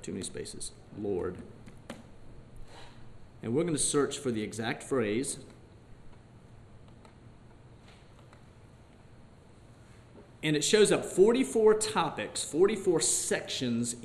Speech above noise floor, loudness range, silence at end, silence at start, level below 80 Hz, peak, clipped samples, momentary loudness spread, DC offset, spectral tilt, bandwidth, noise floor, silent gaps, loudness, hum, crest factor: 26 dB; 14 LU; 0 s; 0 s; -56 dBFS; -10 dBFS; under 0.1%; 23 LU; under 0.1%; -3.5 dB/octave; 13 kHz; -55 dBFS; none; -29 LUFS; none; 22 dB